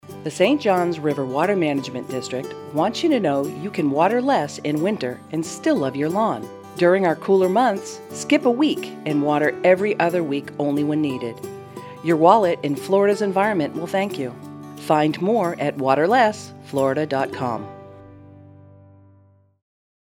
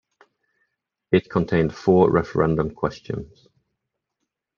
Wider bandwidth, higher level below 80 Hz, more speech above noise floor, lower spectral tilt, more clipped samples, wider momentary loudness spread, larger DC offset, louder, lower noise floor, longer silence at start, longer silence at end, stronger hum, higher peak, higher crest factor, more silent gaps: first, 19 kHz vs 7 kHz; second, -70 dBFS vs -48 dBFS; second, 34 dB vs 60 dB; second, -6 dB/octave vs -8.5 dB/octave; neither; about the same, 13 LU vs 14 LU; neither; about the same, -21 LUFS vs -21 LUFS; second, -55 dBFS vs -81 dBFS; second, 0.05 s vs 1.1 s; first, 1.6 s vs 1.3 s; neither; first, 0 dBFS vs -4 dBFS; about the same, 20 dB vs 20 dB; neither